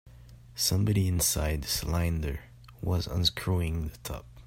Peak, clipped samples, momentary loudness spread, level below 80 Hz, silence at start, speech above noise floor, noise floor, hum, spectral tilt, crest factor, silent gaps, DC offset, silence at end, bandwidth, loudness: -10 dBFS; under 0.1%; 13 LU; -42 dBFS; 0.05 s; 22 dB; -50 dBFS; none; -4 dB/octave; 18 dB; none; under 0.1%; 0 s; 16.5 kHz; -29 LUFS